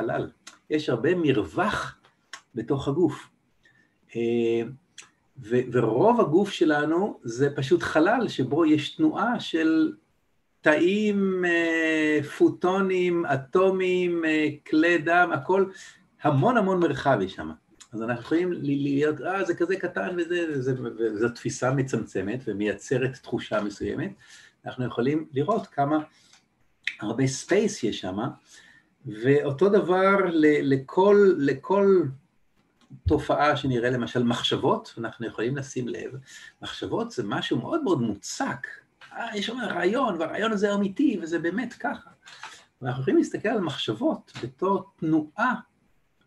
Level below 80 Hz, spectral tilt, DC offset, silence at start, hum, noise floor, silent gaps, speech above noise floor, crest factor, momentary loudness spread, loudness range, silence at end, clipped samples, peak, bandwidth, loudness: -56 dBFS; -6 dB/octave; under 0.1%; 0 s; none; -72 dBFS; none; 47 dB; 20 dB; 13 LU; 7 LU; 0.65 s; under 0.1%; -6 dBFS; 12 kHz; -25 LUFS